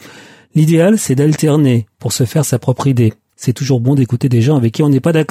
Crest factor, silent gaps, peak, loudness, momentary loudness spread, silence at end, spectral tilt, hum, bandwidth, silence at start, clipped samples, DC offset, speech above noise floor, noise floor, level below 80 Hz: 10 dB; none; -2 dBFS; -13 LUFS; 6 LU; 0.05 s; -6.5 dB/octave; none; 15.5 kHz; 0.05 s; under 0.1%; under 0.1%; 27 dB; -39 dBFS; -58 dBFS